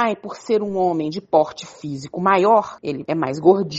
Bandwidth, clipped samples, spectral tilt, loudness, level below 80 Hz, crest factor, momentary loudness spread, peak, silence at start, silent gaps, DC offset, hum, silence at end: 8 kHz; under 0.1%; -6.5 dB/octave; -20 LUFS; -62 dBFS; 18 dB; 14 LU; 0 dBFS; 0 s; none; under 0.1%; none; 0 s